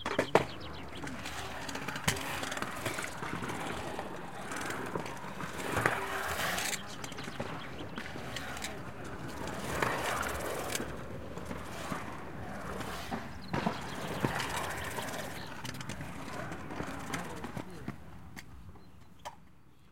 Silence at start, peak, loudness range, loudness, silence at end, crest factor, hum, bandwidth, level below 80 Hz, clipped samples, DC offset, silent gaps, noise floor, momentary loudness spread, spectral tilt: 0 s; -6 dBFS; 6 LU; -37 LUFS; 0 s; 32 dB; none; 16.5 kHz; -56 dBFS; under 0.1%; 0.5%; none; -60 dBFS; 12 LU; -4 dB/octave